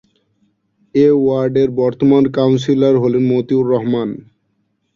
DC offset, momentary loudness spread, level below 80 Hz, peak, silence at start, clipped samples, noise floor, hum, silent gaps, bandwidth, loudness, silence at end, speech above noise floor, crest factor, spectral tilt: under 0.1%; 7 LU; -54 dBFS; -2 dBFS; 0.95 s; under 0.1%; -66 dBFS; none; none; 7.2 kHz; -14 LUFS; 0.8 s; 52 dB; 14 dB; -8.5 dB/octave